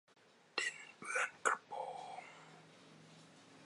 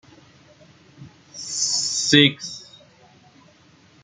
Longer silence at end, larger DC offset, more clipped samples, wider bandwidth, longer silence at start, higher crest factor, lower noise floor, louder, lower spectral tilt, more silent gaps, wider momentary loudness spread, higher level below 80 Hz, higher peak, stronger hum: second, 0 s vs 1.4 s; neither; neither; first, 11.5 kHz vs 9.6 kHz; second, 0.55 s vs 1 s; about the same, 26 dB vs 24 dB; first, -61 dBFS vs -54 dBFS; second, -41 LUFS vs -18 LUFS; second, -0.5 dB/octave vs -2.5 dB/octave; neither; about the same, 23 LU vs 22 LU; second, under -90 dBFS vs -64 dBFS; second, -18 dBFS vs 0 dBFS; neither